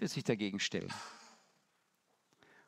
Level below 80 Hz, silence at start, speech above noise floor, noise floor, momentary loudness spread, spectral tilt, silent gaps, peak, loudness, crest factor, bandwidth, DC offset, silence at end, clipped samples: -80 dBFS; 0 s; 39 dB; -77 dBFS; 15 LU; -4 dB/octave; none; -16 dBFS; -38 LUFS; 24 dB; 15.5 kHz; under 0.1%; 1.35 s; under 0.1%